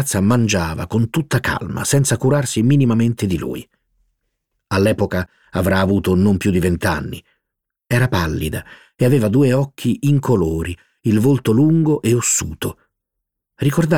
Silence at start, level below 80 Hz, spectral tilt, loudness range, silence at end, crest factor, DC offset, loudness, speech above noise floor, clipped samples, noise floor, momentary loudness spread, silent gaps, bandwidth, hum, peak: 0 s; -40 dBFS; -5.5 dB/octave; 3 LU; 0 s; 14 dB; under 0.1%; -17 LUFS; 64 dB; under 0.1%; -80 dBFS; 10 LU; none; 17.5 kHz; none; -2 dBFS